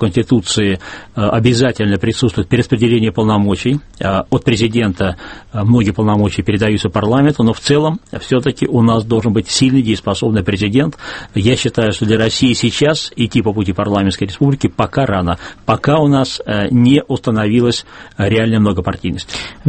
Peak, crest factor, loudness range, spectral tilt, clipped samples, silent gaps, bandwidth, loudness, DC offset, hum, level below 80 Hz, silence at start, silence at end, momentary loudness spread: 0 dBFS; 14 dB; 1 LU; -6 dB/octave; under 0.1%; none; 8.8 kHz; -14 LUFS; under 0.1%; none; -38 dBFS; 0 s; 0 s; 7 LU